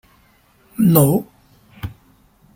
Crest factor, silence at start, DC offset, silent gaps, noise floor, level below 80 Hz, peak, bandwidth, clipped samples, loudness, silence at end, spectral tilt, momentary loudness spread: 20 dB; 0.8 s; under 0.1%; none; -55 dBFS; -50 dBFS; 0 dBFS; 16.5 kHz; under 0.1%; -15 LUFS; 0.65 s; -7 dB/octave; 21 LU